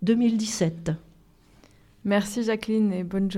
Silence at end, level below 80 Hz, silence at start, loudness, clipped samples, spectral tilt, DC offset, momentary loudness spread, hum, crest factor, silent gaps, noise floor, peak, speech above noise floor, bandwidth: 0 s; -56 dBFS; 0 s; -26 LUFS; under 0.1%; -5.5 dB/octave; under 0.1%; 10 LU; none; 16 dB; none; -56 dBFS; -10 dBFS; 32 dB; 14.5 kHz